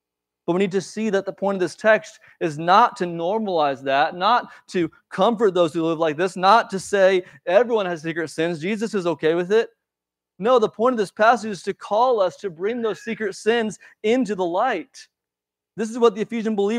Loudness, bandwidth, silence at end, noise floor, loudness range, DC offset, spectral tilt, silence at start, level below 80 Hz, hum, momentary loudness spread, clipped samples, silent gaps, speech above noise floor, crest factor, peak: -21 LUFS; 12 kHz; 0 s; -87 dBFS; 4 LU; under 0.1%; -5 dB/octave; 0.5 s; -72 dBFS; none; 9 LU; under 0.1%; none; 67 dB; 20 dB; -2 dBFS